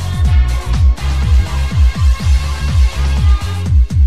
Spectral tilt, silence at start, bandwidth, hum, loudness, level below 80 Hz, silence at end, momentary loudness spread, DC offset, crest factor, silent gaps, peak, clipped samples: -6 dB/octave; 0 s; 11.5 kHz; none; -14 LUFS; -12 dBFS; 0 s; 3 LU; 3%; 10 dB; none; -2 dBFS; under 0.1%